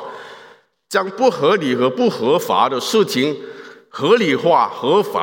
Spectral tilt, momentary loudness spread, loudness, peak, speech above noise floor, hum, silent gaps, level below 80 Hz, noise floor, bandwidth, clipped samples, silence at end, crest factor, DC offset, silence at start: -4.5 dB/octave; 13 LU; -17 LUFS; -2 dBFS; 31 dB; none; none; -74 dBFS; -47 dBFS; 17 kHz; under 0.1%; 0 s; 16 dB; under 0.1%; 0 s